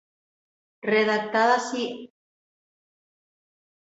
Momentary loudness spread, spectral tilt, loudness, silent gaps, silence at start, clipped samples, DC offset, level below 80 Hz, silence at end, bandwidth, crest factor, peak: 12 LU; -3.5 dB/octave; -24 LUFS; none; 0.85 s; under 0.1%; under 0.1%; -76 dBFS; 1.9 s; 8 kHz; 20 dB; -8 dBFS